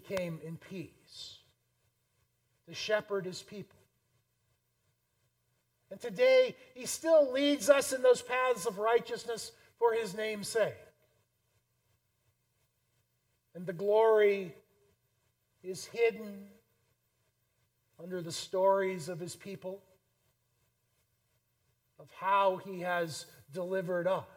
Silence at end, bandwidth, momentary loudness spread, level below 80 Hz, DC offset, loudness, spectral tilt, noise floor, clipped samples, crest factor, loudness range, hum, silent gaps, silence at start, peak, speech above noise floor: 0.1 s; 17 kHz; 20 LU; -78 dBFS; under 0.1%; -31 LUFS; -4 dB/octave; -78 dBFS; under 0.1%; 24 dB; 12 LU; 60 Hz at -75 dBFS; none; 0.05 s; -10 dBFS; 46 dB